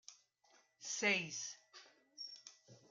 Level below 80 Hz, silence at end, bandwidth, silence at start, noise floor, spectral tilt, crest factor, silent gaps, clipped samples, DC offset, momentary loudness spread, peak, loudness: under -90 dBFS; 0.1 s; 11 kHz; 0.1 s; -73 dBFS; -1.5 dB/octave; 24 dB; none; under 0.1%; under 0.1%; 25 LU; -22 dBFS; -40 LUFS